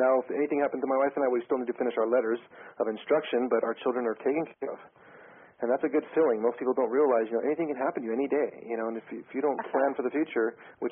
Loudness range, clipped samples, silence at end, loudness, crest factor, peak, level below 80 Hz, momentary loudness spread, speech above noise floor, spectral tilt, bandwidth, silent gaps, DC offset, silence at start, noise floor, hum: 3 LU; under 0.1%; 0 s; -29 LUFS; 16 dB; -12 dBFS; -78 dBFS; 9 LU; 24 dB; -0.5 dB/octave; 3.7 kHz; none; under 0.1%; 0 s; -53 dBFS; none